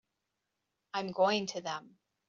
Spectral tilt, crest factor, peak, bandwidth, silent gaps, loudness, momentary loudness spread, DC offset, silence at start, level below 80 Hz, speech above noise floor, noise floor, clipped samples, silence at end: -2.5 dB/octave; 20 dB; -16 dBFS; 7.4 kHz; none; -34 LUFS; 11 LU; under 0.1%; 0.95 s; -80 dBFS; 52 dB; -85 dBFS; under 0.1%; 0.45 s